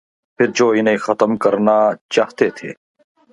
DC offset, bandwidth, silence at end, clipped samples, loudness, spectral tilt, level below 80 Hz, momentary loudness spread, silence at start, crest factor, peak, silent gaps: under 0.1%; 11 kHz; 0.6 s; under 0.1%; -16 LUFS; -5 dB/octave; -62 dBFS; 5 LU; 0.4 s; 16 dB; 0 dBFS; 2.01-2.09 s